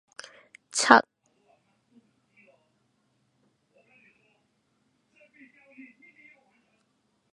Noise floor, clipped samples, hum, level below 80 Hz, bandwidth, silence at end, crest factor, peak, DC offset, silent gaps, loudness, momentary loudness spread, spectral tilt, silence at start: -73 dBFS; under 0.1%; none; -78 dBFS; 10.5 kHz; 6.3 s; 32 dB; 0 dBFS; under 0.1%; none; -21 LUFS; 28 LU; -1.5 dB/octave; 0.75 s